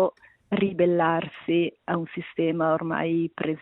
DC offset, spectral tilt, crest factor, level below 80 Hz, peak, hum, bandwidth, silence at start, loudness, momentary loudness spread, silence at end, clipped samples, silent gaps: under 0.1%; -10.5 dB/octave; 16 dB; -66 dBFS; -10 dBFS; none; 4.1 kHz; 0 s; -26 LUFS; 7 LU; 0.05 s; under 0.1%; none